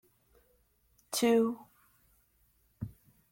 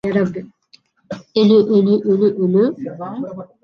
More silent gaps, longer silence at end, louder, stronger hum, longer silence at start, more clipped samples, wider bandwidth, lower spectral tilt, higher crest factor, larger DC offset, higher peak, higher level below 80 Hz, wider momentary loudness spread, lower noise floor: neither; first, 0.4 s vs 0.2 s; second, -30 LUFS vs -16 LUFS; neither; first, 1.1 s vs 0.05 s; neither; first, 16.5 kHz vs 6.6 kHz; second, -4 dB/octave vs -8.5 dB/octave; first, 20 dB vs 14 dB; neither; second, -16 dBFS vs -2 dBFS; second, -68 dBFS vs -60 dBFS; about the same, 19 LU vs 18 LU; first, -71 dBFS vs -53 dBFS